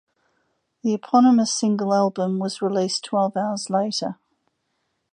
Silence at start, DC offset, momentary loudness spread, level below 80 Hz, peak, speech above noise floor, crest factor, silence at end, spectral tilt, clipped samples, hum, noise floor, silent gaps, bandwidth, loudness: 0.85 s; under 0.1%; 10 LU; -74 dBFS; -6 dBFS; 53 dB; 18 dB; 1 s; -5 dB/octave; under 0.1%; none; -74 dBFS; none; 10.5 kHz; -21 LUFS